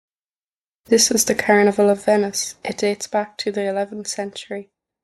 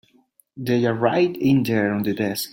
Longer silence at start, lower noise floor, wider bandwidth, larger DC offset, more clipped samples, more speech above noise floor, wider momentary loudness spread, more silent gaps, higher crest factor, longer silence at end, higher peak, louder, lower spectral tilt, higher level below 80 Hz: first, 0.9 s vs 0.55 s; first, under -90 dBFS vs -59 dBFS; second, 12.5 kHz vs 17 kHz; neither; neither; first, over 71 dB vs 39 dB; first, 13 LU vs 5 LU; neither; about the same, 16 dB vs 18 dB; first, 0.4 s vs 0.05 s; about the same, -4 dBFS vs -4 dBFS; about the same, -19 LUFS vs -21 LUFS; second, -3 dB/octave vs -6 dB/octave; about the same, -62 dBFS vs -60 dBFS